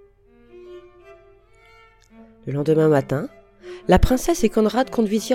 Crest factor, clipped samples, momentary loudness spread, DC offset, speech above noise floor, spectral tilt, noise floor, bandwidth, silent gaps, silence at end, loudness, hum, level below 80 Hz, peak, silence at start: 20 dB; under 0.1%; 21 LU; under 0.1%; 34 dB; -6 dB/octave; -52 dBFS; 16.5 kHz; none; 0 s; -20 LUFS; none; -34 dBFS; -2 dBFS; 0.55 s